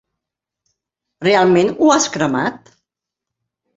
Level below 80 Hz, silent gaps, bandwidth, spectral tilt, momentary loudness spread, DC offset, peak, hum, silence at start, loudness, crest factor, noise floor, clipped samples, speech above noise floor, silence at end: -58 dBFS; none; 8 kHz; -4 dB/octave; 9 LU; under 0.1%; -2 dBFS; none; 1.2 s; -15 LUFS; 16 dB; -83 dBFS; under 0.1%; 69 dB; 1.2 s